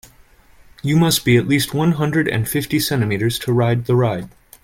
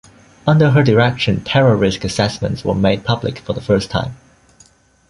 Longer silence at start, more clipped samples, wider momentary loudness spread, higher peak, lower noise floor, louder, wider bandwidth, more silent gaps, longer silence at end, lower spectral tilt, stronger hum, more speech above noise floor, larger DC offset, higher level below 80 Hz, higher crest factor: first, 0.85 s vs 0.45 s; neither; second, 6 LU vs 11 LU; second, -4 dBFS vs 0 dBFS; about the same, -49 dBFS vs -51 dBFS; about the same, -18 LUFS vs -16 LUFS; first, 17 kHz vs 11.5 kHz; neither; second, 0.35 s vs 0.95 s; about the same, -5.5 dB/octave vs -6.5 dB/octave; neither; second, 32 dB vs 36 dB; neither; second, -46 dBFS vs -40 dBFS; about the same, 14 dB vs 16 dB